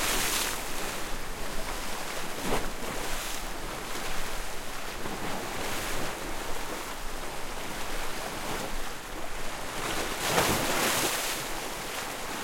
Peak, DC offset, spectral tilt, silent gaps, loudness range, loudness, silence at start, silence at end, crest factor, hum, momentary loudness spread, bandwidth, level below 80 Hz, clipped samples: -10 dBFS; under 0.1%; -2 dB/octave; none; 6 LU; -32 LUFS; 0 s; 0 s; 20 dB; none; 11 LU; 16.5 kHz; -40 dBFS; under 0.1%